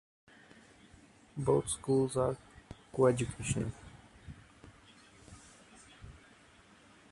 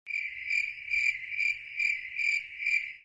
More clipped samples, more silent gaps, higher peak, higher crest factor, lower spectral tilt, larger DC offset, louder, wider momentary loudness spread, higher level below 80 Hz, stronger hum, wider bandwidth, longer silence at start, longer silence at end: neither; neither; about the same, -14 dBFS vs -16 dBFS; first, 22 dB vs 16 dB; first, -6 dB/octave vs 2.5 dB/octave; neither; second, -33 LUFS vs -29 LUFS; first, 26 LU vs 3 LU; first, -58 dBFS vs -70 dBFS; neither; first, 11.5 kHz vs 10 kHz; first, 1.35 s vs 0.05 s; first, 1 s vs 0.05 s